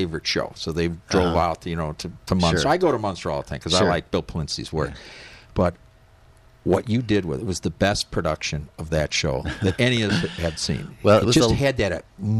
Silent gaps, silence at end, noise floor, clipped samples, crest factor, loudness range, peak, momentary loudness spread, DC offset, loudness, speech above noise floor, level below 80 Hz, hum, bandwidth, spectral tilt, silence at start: none; 0 s; -52 dBFS; under 0.1%; 18 dB; 5 LU; -6 dBFS; 9 LU; under 0.1%; -23 LUFS; 30 dB; -40 dBFS; none; 14 kHz; -5 dB/octave; 0 s